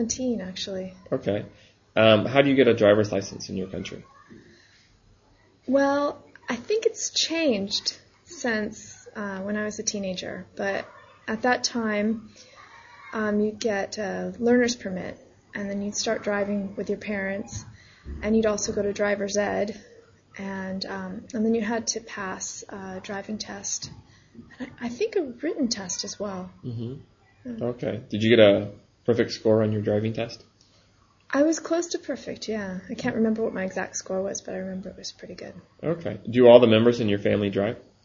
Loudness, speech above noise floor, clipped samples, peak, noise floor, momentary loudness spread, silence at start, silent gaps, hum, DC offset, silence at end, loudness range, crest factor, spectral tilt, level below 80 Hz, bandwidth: -25 LUFS; 36 dB; under 0.1%; 0 dBFS; -60 dBFS; 18 LU; 0 s; none; none; under 0.1%; 0.25 s; 8 LU; 26 dB; -4.5 dB/octave; -56 dBFS; 7.6 kHz